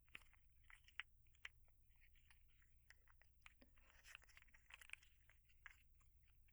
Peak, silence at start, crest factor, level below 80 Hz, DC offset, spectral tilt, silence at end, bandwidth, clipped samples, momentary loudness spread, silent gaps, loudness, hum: -30 dBFS; 0 s; 38 dB; -74 dBFS; under 0.1%; -1 dB/octave; 0 s; over 20 kHz; under 0.1%; 12 LU; none; -63 LUFS; none